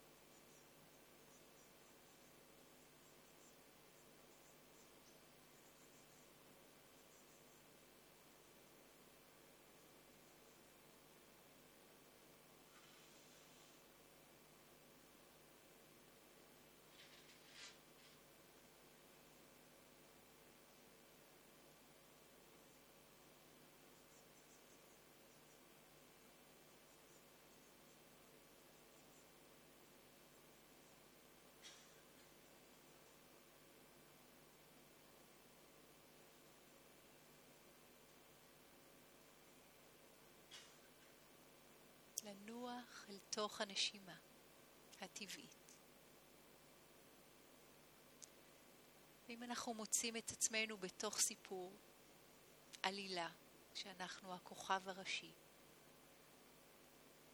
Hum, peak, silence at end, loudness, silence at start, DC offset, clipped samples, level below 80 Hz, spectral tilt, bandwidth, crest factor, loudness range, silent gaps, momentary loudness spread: none; -20 dBFS; 0 s; -48 LUFS; 0 s; under 0.1%; under 0.1%; -86 dBFS; -1 dB/octave; over 20 kHz; 36 dB; 20 LU; none; 19 LU